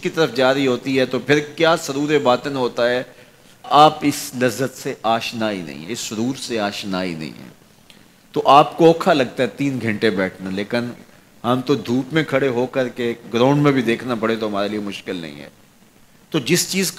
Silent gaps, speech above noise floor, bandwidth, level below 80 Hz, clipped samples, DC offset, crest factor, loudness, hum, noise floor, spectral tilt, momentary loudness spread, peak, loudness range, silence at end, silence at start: none; 32 dB; 16 kHz; -60 dBFS; under 0.1%; under 0.1%; 18 dB; -19 LUFS; none; -50 dBFS; -4.5 dB/octave; 13 LU; -2 dBFS; 5 LU; 0 s; 0 s